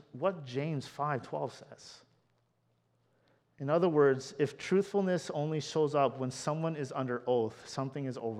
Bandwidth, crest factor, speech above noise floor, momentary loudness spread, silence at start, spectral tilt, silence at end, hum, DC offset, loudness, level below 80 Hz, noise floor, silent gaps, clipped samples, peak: 12 kHz; 20 dB; 42 dB; 10 LU; 0.15 s; -6 dB/octave; 0 s; none; under 0.1%; -33 LUFS; -78 dBFS; -75 dBFS; none; under 0.1%; -14 dBFS